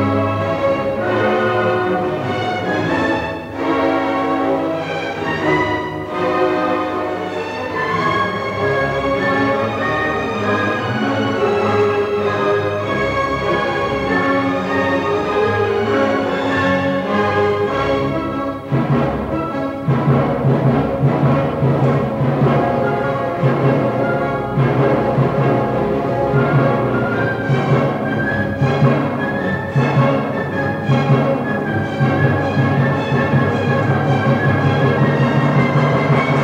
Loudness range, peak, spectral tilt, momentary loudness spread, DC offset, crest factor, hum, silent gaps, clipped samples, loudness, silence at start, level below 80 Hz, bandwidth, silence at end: 3 LU; -2 dBFS; -7.5 dB/octave; 5 LU; under 0.1%; 14 dB; none; none; under 0.1%; -17 LUFS; 0 s; -42 dBFS; 8.2 kHz; 0 s